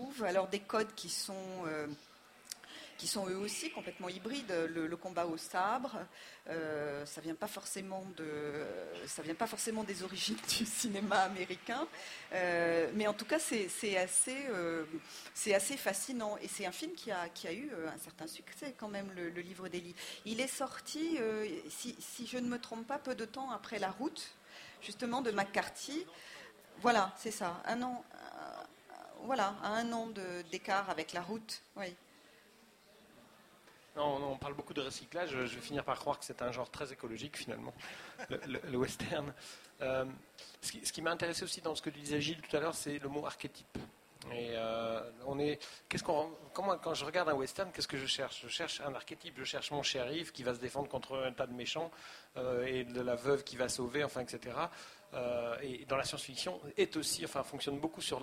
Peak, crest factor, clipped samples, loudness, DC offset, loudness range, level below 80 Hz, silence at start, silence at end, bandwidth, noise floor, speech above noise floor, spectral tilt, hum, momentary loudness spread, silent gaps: -14 dBFS; 24 dB; under 0.1%; -39 LUFS; under 0.1%; 7 LU; -70 dBFS; 0 s; 0 s; 16 kHz; -64 dBFS; 25 dB; -3 dB/octave; none; 12 LU; none